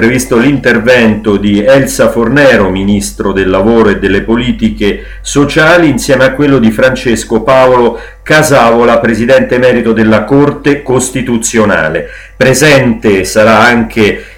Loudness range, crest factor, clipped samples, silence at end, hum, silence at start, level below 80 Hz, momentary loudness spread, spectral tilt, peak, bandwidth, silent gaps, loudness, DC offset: 2 LU; 8 dB; 1%; 0.05 s; none; 0 s; -28 dBFS; 6 LU; -5 dB/octave; 0 dBFS; 17 kHz; none; -7 LUFS; under 0.1%